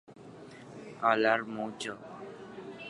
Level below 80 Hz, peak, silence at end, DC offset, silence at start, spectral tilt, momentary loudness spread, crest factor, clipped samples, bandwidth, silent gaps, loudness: -76 dBFS; -10 dBFS; 0 s; under 0.1%; 0.1 s; -4.5 dB/octave; 23 LU; 24 dB; under 0.1%; 11.5 kHz; none; -30 LUFS